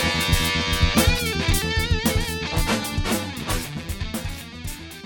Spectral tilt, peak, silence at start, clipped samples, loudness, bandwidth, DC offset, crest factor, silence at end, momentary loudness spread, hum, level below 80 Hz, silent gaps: -4 dB/octave; -6 dBFS; 0 s; under 0.1%; -23 LUFS; 17.5 kHz; under 0.1%; 18 dB; 0 s; 13 LU; none; -28 dBFS; none